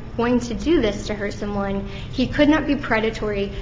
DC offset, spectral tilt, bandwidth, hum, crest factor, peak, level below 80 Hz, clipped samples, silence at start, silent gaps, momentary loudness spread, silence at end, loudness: under 0.1%; -6 dB/octave; 7.8 kHz; none; 18 dB; -4 dBFS; -34 dBFS; under 0.1%; 0 s; none; 9 LU; 0 s; -22 LUFS